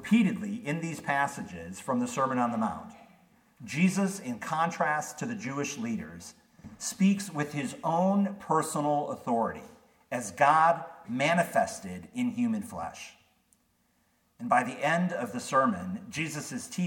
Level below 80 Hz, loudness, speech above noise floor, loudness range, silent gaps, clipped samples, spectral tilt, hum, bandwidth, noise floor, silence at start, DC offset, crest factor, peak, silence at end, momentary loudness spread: -68 dBFS; -29 LUFS; 42 dB; 4 LU; none; under 0.1%; -5.5 dB/octave; none; 17.5 kHz; -71 dBFS; 0 s; under 0.1%; 20 dB; -10 dBFS; 0 s; 13 LU